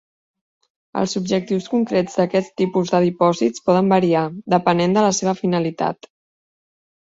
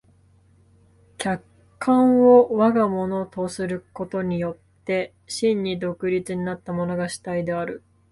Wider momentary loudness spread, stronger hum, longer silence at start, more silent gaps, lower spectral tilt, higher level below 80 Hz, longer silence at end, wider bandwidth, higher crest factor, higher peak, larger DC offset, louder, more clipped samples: second, 7 LU vs 15 LU; neither; second, 0.95 s vs 1.2 s; neither; about the same, -5.5 dB/octave vs -6.5 dB/octave; about the same, -60 dBFS vs -58 dBFS; first, 1.1 s vs 0.35 s; second, 7.8 kHz vs 11.5 kHz; about the same, 18 dB vs 20 dB; about the same, -2 dBFS vs -4 dBFS; neither; first, -19 LUFS vs -22 LUFS; neither